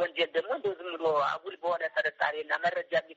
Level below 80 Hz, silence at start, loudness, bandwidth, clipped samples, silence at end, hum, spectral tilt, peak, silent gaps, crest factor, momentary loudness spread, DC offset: -80 dBFS; 0 s; -30 LUFS; 7.6 kHz; under 0.1%; 0.05 s; none; 0 dB/octave; -14 dBFS; none; 18 dB; 5 LU; under 0.1%